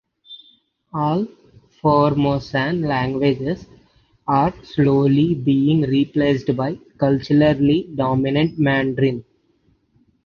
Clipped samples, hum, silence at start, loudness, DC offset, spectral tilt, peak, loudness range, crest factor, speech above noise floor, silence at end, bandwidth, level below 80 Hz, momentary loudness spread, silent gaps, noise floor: under 0.1%; none; 0.3 s; -19 LUFS; under 0.1%; -8.5 dB/octave; -4 dBFS; 3 LU; 16 dB; 44 dB; 1.05 s; 6.6 kHz; -48 dBFS; 8 LU; none; -61 dBFS